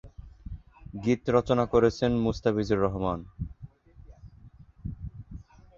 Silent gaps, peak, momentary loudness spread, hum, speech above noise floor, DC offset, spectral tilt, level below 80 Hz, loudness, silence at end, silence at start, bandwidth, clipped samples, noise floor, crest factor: none; -8 dBFS; 22 LU; none; 27 dB; under 0.1%; -7.5 dB/octave; -46 dBFS; -26 LUFS; 0.35 s; 0.05 s; 7.4 kHz; under 0.1%; -52 dBFS; 20 dB